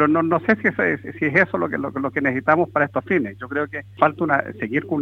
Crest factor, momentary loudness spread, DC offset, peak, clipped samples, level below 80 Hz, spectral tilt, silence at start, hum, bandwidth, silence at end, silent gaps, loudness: 18 dB; 7 LU; under 0.1%; -2 dBFS; under 0.1%; -60 dBFS; -8.5 dB/octave; 0 s; none; 6.6 kHz; 0 s; none; -21 LUFS